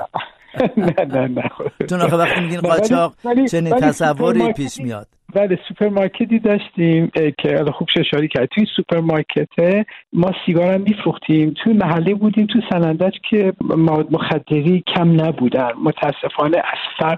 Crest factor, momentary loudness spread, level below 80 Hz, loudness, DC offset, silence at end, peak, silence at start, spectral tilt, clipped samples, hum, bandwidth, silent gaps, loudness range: 14 dB; 5 LU; -52 dBFS; -17 LUFS; under 0.1%; 0 s; -2 dBFS; 0 s; -7 dB/octave; under 0.1%; none; 12.5 kHz; none; 2 LU